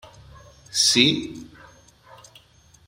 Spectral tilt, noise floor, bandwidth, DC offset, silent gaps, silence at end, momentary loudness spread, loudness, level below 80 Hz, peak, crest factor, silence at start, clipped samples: -2 dB/octave; -55 dBFS; 16 kHz; under 0.1%; none; 1.45 s; 22 LU; -18 LUFS; -56 dBFS; -2 dBFS; 24 dB; 0.75 s; under 0.1%